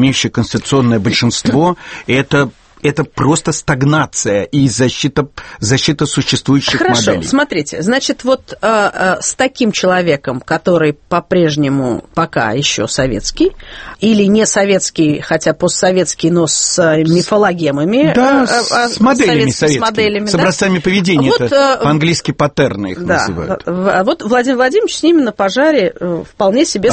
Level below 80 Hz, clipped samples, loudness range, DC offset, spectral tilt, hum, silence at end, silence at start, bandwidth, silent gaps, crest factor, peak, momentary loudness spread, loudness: -40 dBFS; under 0.1%; 3 LU; under 0.1%; -4.5 dB/octave; none; 0 s; 0 s; 8.8 kHz; none; 12 dB; 0 dBFS; 6 LU; -13 LUFS